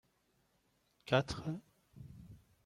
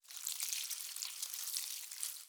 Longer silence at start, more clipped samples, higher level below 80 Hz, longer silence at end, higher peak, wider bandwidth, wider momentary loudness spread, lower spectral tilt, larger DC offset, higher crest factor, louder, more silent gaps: first, 1.05 s vs 0.05 s; neither; first, -64 dBFS vs under -90 dBFS; first, 0.3 s vs 0 s; about the same, -16 dBFS vs -18 dBFS; second, 14 kHz vs over 20 kHz; first, 23 LU vs 4 LU; first, -6 dB/octave vs 7.5 dB/octave; neither; about the same, 26 dB vs 26 dB; first, -37 LUFS vs -40 LUFS; neither